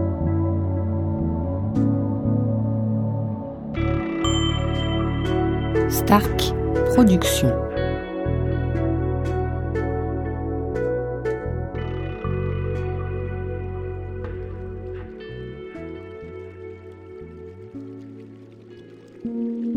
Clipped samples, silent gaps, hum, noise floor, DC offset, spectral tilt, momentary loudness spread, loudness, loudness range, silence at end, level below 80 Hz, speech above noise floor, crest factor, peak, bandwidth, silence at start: under 0.1%; none; none; -43 dBFS; under 0.1%; -6.5 dB/octave; 19 LU; -24 LUFS; 16 LU; 0 s; -34 dBFS; 26 dB; 22 dB; -2 dBFS; 16 kHz; 0 s